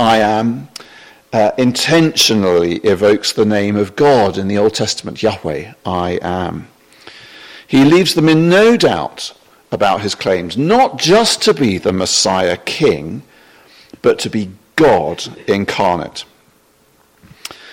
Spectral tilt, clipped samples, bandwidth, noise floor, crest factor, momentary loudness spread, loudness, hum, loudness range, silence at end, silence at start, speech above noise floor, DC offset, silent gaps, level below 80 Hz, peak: -4.5 dB/octave; under 0.1%; 16.5 kHz; -53 dBFS; 14 dB; 14 LU; -13 LUFS; none; 5 LU; 0 s; 0 s; 39 dB; under 0.1%; none; -50 dBFS; 0 dBFS